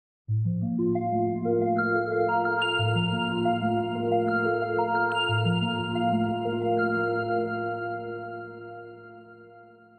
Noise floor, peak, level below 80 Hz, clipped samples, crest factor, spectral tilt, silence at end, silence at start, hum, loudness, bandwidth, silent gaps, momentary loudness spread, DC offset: -51 dBFS; -14 dBFS; -62 dBFS; under 0.1%; 14 dB; -7.5 dB/octave; 0.3 s; 0.3 s; none; -26 LUFS; 9 kHz; none; 11 LU; under 0.1%